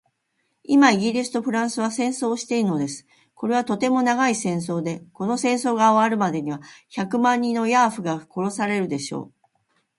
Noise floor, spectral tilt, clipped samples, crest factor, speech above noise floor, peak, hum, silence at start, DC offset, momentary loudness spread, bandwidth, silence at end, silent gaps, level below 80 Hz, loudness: -73 dBFS; -5 dB/octave; under 0.1%; 22 dB; 51 dB; -2 dBFS; none; 0.7 s; under 0.1%; 13 LU; 11.5 kHz; 0.7 s; none; -70 dBFS; -22 LUFS